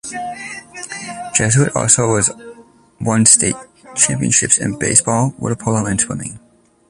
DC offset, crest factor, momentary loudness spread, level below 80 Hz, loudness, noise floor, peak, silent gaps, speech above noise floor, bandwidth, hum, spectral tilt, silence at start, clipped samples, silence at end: under 0.1%; 18 dB; 16 LU; -46 dBFS; -14 LUFS; -43 dBFS; 0 dBFS; none; 28 dB; 14 kHz; none; -3.5 dB/octave; 0.05 s; under 0.1%; 0.5 s